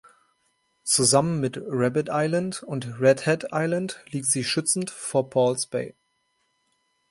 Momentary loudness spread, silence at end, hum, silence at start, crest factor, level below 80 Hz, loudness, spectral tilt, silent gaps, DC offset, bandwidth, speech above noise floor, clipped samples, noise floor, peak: 11 LU; 1.2 s; none; 0.85 s; 20 dB; -64 dBFS; -24 LUFS; -4 dB/octave; none; under 0.1%; 12 kHz; 48 dB; under 0.1%; -72 dBFS; -6 dBFS